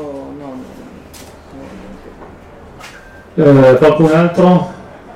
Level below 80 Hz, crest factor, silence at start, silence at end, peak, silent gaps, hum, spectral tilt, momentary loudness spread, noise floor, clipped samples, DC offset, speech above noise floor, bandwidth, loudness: -42 dBFS; 12 dB; 0 s; 0.35 s; -2 dBFS; none; none; -8 dB/octave; 26 LU; -36 dBFS; under 0.1%; under 0.1%; 28 dB; 12.5 kHz; -10 LUFS